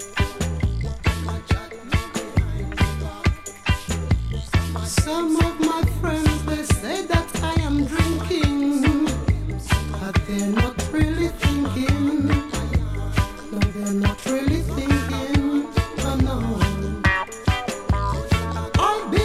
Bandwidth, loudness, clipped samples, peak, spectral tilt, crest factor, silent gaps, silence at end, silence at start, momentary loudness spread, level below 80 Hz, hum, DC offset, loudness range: 15 kHz; -23 LUFS; under 0.1%; -2 dBFS; -5.5 dB/octave; 18 dB; none; 0 s; 0 s; 5 LU; -28 dBFS; none; under 0.1%; 3 LU